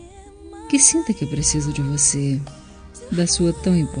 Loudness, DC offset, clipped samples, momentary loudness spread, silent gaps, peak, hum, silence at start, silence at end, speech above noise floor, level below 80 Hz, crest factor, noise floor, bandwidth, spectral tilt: -18 LUFS; under 0.1%; under 0.1%; 13 LU; none; 0 dBFS; none; 0 s; 0 s; 22 dB; -38 dBFS; 20 dB; -41 dBFS; 10 kHz; -4 dB/octave